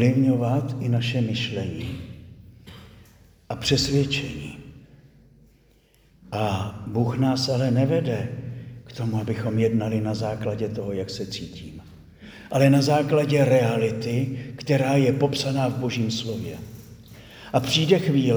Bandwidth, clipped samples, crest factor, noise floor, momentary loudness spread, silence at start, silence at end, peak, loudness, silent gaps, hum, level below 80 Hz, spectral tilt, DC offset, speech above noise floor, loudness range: over 20 kHz; under 0.1%; 20 dB; -58 dBFS; 19 LU; 0 s; 0 s; -4 dBFS; -23 LUFS; none; none; -52 dBFS; -6 dB/octave; under 0.1%; 36 dB; 6 LU